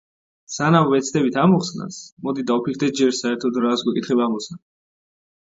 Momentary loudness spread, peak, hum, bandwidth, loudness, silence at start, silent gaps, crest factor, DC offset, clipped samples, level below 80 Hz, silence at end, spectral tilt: 13 LU; -2 dBFS; none; 7.8 kHz; -20 LUFS; 0.5 s; 2.12-2.17 s; 20 dB; under 0.1%; under 0.1%; -64 dBFS; 0.85 s; -5.5 dB/octave